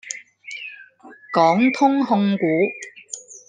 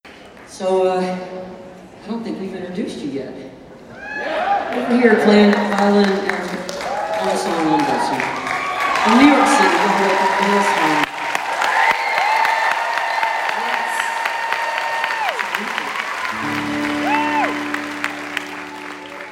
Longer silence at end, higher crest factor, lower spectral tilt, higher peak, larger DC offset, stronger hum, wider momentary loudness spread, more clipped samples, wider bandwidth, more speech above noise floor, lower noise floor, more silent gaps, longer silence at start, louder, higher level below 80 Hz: about the same, 0.1 s vs 0 s; about the same, 18 dB vs 18 dB; about the same, -5.5 dB/octave vs -4.5 dB/octave; about the same, -2 dBFS vs 0 dBFS; neither; neither; first, 18 LU vs 15 LU; neither; second, 9.8 kHz vs 16.5 kHz; first, 28 dB vs 24 dB; first, -45 dBFS vs -40 dBFS; neither; about the same, 0.05 s vs 0.05 s; about the same, -18 LUFS vs -18 LUFS; second, -72 dBFS vs -58 dBFS